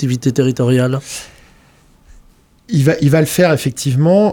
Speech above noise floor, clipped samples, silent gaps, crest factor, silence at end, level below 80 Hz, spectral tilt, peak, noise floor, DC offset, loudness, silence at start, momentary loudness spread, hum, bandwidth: 35 dB; under 0.1%; none; 14 dB; 0 s; -46 dBFS; -6.5 dB/octave; 0 dBFS; -48 dBFS; under 0.1%; -14 LUFS; 0 s; 9 LU; none; 19.5 kHz